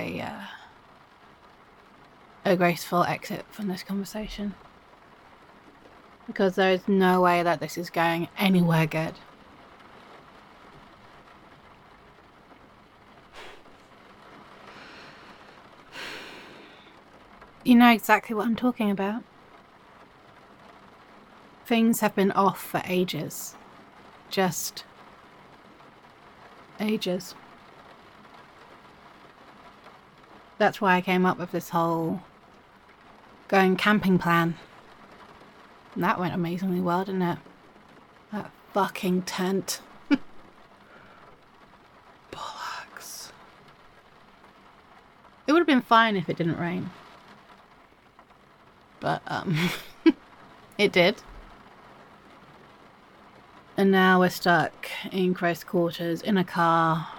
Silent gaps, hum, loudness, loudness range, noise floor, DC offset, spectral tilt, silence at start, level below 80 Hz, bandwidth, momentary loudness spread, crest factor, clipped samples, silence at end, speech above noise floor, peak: none; none; -25 LUFS; 17 LU; -56 dBFS; under 0.1%; -5.5 dB/octave; 0 s; -62 dBFS; 17.5 kHz; 20 LU; 24 dB; under 0.1%; 0 s; 32 dB; -4 dBFS